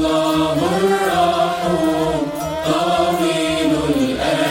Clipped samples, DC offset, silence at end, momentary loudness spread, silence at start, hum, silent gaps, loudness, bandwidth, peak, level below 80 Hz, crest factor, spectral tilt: under 0.1%; under 0.1%; 0 s; 3 LU; 0 s; none; none; -17 LUFS; 16.5 kHz; -4 dBFS; -42 dBFS; 14 dB; -5 dB/octave